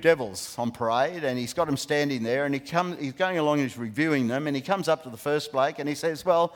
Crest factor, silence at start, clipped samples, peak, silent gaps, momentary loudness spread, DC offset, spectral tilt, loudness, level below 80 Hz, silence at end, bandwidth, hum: 20 dB; 0 s; under 0.1%; -6 dBFS; none; 5 LU; under 0.1%; -5 dB/octave; -27 LUFS; -66 dBFS; 0 s; 18.5 kHz; none